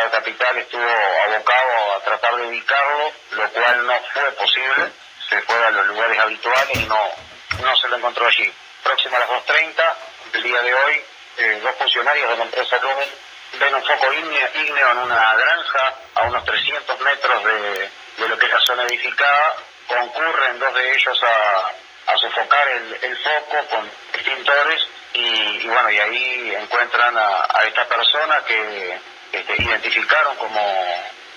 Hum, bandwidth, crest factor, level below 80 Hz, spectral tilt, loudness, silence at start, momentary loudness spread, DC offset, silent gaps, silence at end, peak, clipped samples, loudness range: none; over 20 kHz; 18 dB; -54 dBFS; -2 dB/octave; -17 LUFS; 0 s; 9 LU; under 0.1%; none; 0 s; 0 dBFS; under 0.1%; 2 LU